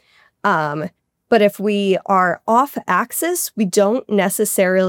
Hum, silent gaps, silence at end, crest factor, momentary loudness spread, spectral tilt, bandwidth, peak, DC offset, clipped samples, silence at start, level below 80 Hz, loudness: none; none; 0 s; 14 dB; 5 LU; -4.5 dB/octave; 17 kHz; -2 dBFS; under 0.1%; under 0.1%; 0.45 s; -72 dBFS; -17 LUFS